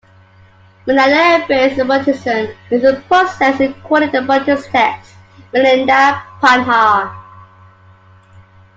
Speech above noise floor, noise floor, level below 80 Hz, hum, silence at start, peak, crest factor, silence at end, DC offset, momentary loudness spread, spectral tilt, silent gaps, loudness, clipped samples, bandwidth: 32 dB; -45 dBFS; -52 dBFS; none; 0.85 s; 0 dBFS; 14 dB; 1.35 s; under 0.1%; 8 LU; -4.5 dB/octave; none; -13 LUFS; under 0.1%; 7.8 kHz